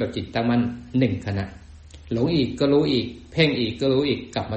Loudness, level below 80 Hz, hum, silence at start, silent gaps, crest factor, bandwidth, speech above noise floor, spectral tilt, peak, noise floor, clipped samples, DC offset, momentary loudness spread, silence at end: -23 LUFS; -48 dBFS; none; 0 s; none; 18 dB; 8.4 kHz; 21 dB; -7 dB/octave; -6 dBFS; -43 dBFS; under 0.1%; under 0.1%; 9 LU; 0 s